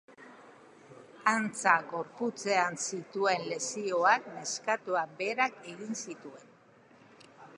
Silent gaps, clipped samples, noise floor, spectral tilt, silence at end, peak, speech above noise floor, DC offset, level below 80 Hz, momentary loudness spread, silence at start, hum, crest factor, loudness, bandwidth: none; under 0.1%; -60 dBFS; -2.5 dB/octave; 0 s; -10 dBFS; 28 dB; under 0.1%; -86 dBFS; 12 LU; 0.1 s; none; 24 dB; -31 LUFS; 11.5 kHz